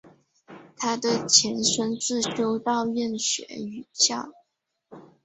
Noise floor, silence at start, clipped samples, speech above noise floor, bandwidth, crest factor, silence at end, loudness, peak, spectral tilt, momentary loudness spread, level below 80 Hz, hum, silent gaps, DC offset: -76 dBFS; 0.05 s; under 0.1%; 51 dB; 8.4 kHz; 24 dB; 0.2 s; -23 LUFS; -2 dBFS; -2 dB/octave; 16 LU; -68 dBFS; none; none; under 0.1%